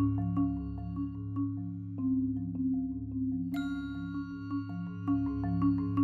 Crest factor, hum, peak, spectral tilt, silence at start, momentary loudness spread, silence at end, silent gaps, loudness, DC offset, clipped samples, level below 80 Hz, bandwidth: 14 dB; none; -18 dBFS; -10 dB/octave; 0 s; 8 LU; 0 s; none; -34 LUFS; under 0.1%; under 0.1%; -50 dBFS; 4.7 kHz